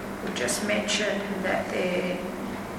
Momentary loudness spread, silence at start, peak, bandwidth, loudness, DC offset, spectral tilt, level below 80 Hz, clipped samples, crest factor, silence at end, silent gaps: 7 LU; 0 s; -12 dBFS; 17 kHz; -27 LUFS; under 0.1%; -3.5 dB/octave; -52 dBFS; under 0.1%; 16 dB; 0 s; none